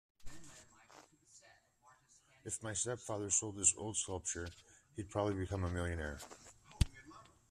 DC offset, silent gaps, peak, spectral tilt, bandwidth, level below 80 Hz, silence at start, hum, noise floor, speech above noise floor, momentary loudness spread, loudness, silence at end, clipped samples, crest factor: under 0.1%; none; -14 dBFS; -3.5 dB/octave; 14 kHz; -52 dBFS; 0.2 s; none; -69 dBFS; 30 dB; 26 LU; -38 LUFS; 0.25 s; under 0.1%; 26 dB